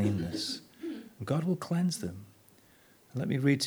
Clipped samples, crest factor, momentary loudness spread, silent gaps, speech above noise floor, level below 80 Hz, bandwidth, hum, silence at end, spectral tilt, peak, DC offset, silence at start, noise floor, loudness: under 0.1%; 18 dB; 12 LU; none; 31 dB; -64 dBFS; over 20 kHz; none; 0 s; -5.5 dB/octave; -14 dBFS; under 0.1%; 0 s; -61 dBFS; -33 LUFS